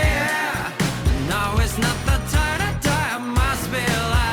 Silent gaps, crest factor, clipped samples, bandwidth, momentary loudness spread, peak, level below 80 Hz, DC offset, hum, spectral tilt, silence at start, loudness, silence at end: none; 12 dB; under 0.1%; 20 kHz; 2 LU; -8 dBFS; -26 dBFS; under 0.1%; none; -4.5 dB/octave; 0 s; -21 LUFS; 0 s